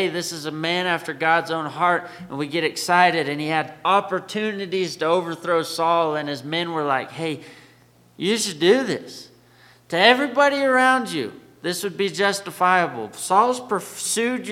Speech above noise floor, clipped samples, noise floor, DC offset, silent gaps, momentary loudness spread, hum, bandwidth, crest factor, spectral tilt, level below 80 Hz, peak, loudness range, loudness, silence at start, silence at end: 32 dB; under 0.1%; -54 dBFS; under 0.1%; none; 11 LU; none; 16.5 kHz; 22 dB; -3.5 dB/octave; -70 dBFS; 0 dBFS; 4 LU; -21 LUFS; 0 s; 0 s